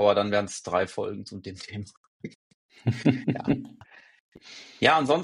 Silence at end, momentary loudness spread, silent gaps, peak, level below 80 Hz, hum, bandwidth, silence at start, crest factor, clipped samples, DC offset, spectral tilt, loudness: 0 s; 22 LU; 1.97-2.20 s, 2.35-2.69 s, 4.20-4.32 s; -4 dBFS; -62 dBFS; none; 11.5 kHz; 0 s; 24 dB; under 0.1%; under 0.1%; -5.5 dB/octave; -26 LUFS